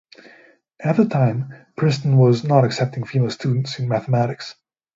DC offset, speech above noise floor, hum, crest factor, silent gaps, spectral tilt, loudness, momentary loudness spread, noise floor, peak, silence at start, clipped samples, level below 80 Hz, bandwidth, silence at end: under 0.1%; 33 dB; none; 18 dB; none; -7.5 dB/octave; -19 LUFS; 12 LU; -52 dBFS; 0 dBFS; 0.8 s; under 0.1%; -60 dBFS; 7.8 kHz; 0.45 s